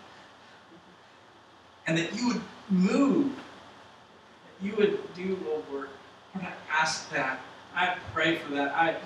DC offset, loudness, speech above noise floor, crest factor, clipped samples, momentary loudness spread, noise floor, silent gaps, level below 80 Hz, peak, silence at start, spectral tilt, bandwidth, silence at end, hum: under 0.1%; -29 LUFS; 27 dB; 20 dB; under 0.1%; 17 LU; -55 dBFS; none; -70 dBFS; -10 dBFS; 0 s; -5 dB/octave; 11 kHz; 0 s; none